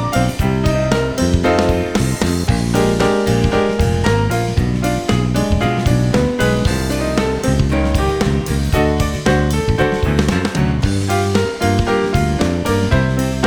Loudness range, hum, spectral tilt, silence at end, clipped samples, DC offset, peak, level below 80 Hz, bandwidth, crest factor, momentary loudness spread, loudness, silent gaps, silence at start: 1 LU; none; -6 dB/octave; 0 s; under 0.1%; under 0.1%; 0 dBFS; -24 dBFS; 20 kHz; 14 dB; 3 LU; -16 LUFS; none; 0 s